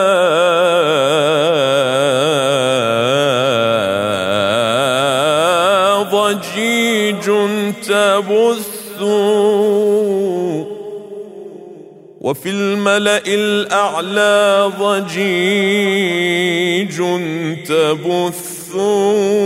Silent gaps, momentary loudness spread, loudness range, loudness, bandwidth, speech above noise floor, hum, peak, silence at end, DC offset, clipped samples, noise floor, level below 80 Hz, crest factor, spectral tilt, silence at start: none; 9 LU; 4 LU; -14 LUFS; 16 kHz; 22 dB; none; -2 dBFS; 0 s; under 0.1%; under 0.1%; -37 dBFS; -62 dBFS; 14 dB; -4 dB/octave; 0 s